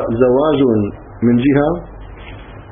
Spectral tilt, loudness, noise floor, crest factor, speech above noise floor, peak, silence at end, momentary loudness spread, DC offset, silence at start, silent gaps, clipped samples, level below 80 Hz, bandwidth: -13 dB/octave; -15 LUFS; -33 dBFS; 14 dB; 20 dB; 0 dBFS; 0.1 s; 22 LU; under 0.1%; 0 s; none; under 0.1%; -36 dBFS; 3.7 kHz